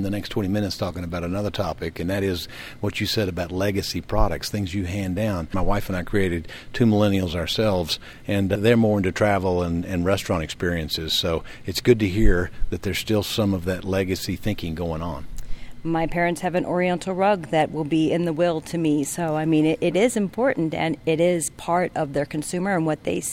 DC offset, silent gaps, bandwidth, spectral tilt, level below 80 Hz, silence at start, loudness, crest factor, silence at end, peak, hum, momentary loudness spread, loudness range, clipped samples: under 0.1%; none; 17 kHz; -5.5 dB/octave; -34 dBFS; 0 s; -23 LUFS; 20 dB; 0 s; -4 dBFS; none; 8 LU; 4 LU; under 0.1%